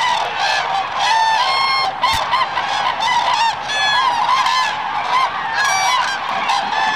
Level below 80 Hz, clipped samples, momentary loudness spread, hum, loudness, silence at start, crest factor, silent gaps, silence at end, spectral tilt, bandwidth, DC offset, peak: -52 dBFS; under 0.1%; 4 LU; none; -16 LUFS; 0 s; 12 dB; none; 0 s; -0.5 dB/octave; 15.5 kHz; 0.4%; -6 dBFS